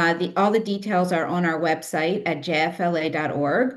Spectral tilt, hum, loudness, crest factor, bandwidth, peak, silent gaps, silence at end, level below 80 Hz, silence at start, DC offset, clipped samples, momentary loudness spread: -6 dB/octave; none; -23 LUFS; 16 dB; 12.5 kHz; -6 dBFS; none; 0 s; -70 dBFS; 0 s; under 0.1%; under 0.1%; 3 LU